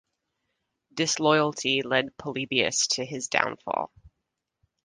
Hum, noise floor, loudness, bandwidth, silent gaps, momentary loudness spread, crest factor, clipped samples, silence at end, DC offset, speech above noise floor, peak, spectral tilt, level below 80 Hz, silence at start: none; -82 dBFS; -25 LUFS; 11 kHz; none; 10 LU; 26 dB; under 0.1%; 0.75 s; under 0.1%; 56 dB; -2 dBFS; -2.5 dB/octave; -66 dBFS; 0.95 s